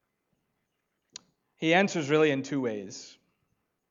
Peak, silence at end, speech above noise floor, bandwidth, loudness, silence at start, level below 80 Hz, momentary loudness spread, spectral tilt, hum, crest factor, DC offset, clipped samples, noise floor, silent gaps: -8 dBFS; 0.8 s; 53 dB; 7.6 kHz; -26 LUFS; 1.6 s; -82 dBFS; 16 LU; -5 dB/octave; none; 22 dB; under 0.1%; under 0.1%; -80 dBFS; none